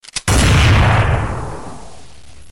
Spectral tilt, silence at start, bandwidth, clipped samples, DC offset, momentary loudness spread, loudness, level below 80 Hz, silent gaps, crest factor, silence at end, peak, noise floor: -4.5 dB/octave; 0 s; 16.5 kHz; under 0.1%; 2%; 19 LU; -13 LUFS; -22 dBFS; none; 10 dB; 0.55 s; -6 dBFS; -42 dBFS